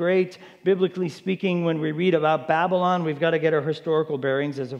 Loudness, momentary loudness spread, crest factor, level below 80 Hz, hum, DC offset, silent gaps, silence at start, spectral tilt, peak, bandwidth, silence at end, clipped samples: -23 LUFS; 5 LU; 16 dB; -78 dBFS; none; under 0.1%; none; 0 s; -7.5 dB/octave; -6 dBFS; 9 kHz; 0 s; under 0.1%